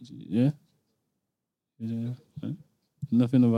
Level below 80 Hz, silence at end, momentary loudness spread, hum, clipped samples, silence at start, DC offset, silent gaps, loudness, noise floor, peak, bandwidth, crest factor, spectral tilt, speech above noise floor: -72 dBFS; 0 s; 18 LU; none; under 0.1%; 0 s; under 0.1%; none; -29 LUFS; -86 dBFS; -12 dBFS; 5.2 kHz; 18 dB; -9.5 dB/octave; 60 dB